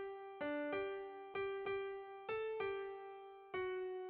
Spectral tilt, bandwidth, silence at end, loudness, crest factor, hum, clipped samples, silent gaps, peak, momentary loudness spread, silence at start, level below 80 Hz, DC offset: -2.5 dB/octave; 4.8 kHz; 0 s; -45 LUFS; 14 dB; none; under 0.1%; none; -30 dBFS; 8 LU; 0 s; -78 dBFS; under 0.1%